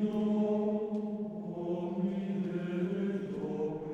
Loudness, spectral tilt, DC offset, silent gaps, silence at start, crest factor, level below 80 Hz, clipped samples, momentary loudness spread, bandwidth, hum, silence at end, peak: -34 LUFS; -9.5 dB/octave; under 0.1%; none; 0 s; 12 dB; -70 dBFS; under 0.1%; 7 LU; 6.8 kHz; none; 0 s; -20 dBFS